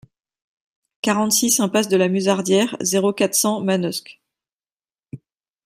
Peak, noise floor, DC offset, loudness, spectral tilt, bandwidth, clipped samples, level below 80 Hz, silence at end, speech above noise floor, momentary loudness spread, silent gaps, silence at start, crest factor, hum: -2 dBFS; under -90 dBFS; under 0.1%; -18 LUFS; -3.5 dB/octave; 16 kHz; under 0.1%; -66 dBFS; 0.5 s; over 71 dB; 6 LU; 4.72-4.76 s; 1.05 s; 18 dB; none